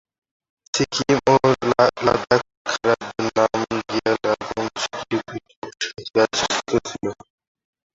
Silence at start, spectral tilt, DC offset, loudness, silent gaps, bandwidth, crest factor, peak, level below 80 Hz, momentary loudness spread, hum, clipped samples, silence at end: 0.75 s; -4 dB/octave; under 0.1%; -21 LUFS; 2.57-2.65 s, 5.56-5.62 s; 8 kHz; 20 dB; -2 dBFS; -52 dBFS; 11 LU; none; under 0.1%; 0.8 s